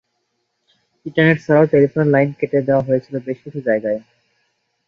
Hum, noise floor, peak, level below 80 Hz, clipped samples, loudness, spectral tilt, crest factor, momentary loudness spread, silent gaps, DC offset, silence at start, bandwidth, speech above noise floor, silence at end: none; -71 dBFS; -2 dBFS; -58 dBFS; under 0.1%; -17 LUFS; -9 dB/octave; 16 dB; 13 LU; none; under 0.1%; 1.05 s; 7 kHz; 55 dB; 0.9 s